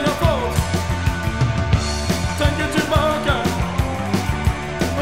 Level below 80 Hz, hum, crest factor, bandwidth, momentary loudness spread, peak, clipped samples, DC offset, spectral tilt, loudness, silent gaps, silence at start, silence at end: -26 dBFS; none; 16 dB; 16 kHz; 4 LU; -4 dBFS; under 0.1%; 1%; -5.5 dB/octave; -20 LUFS; none; 0 s; 0 s